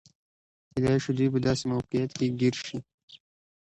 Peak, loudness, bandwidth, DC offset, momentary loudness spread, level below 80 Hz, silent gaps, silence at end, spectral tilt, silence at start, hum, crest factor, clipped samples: -12 dBFS; -28 LUFS; 10.5 kHz; under 0.1%; 11 LU; -56 dBFS; 2.94-3.08 s; 0.6 s; -6.5 dB/octave; 0.75 s; none; 18 dB; under 0.1%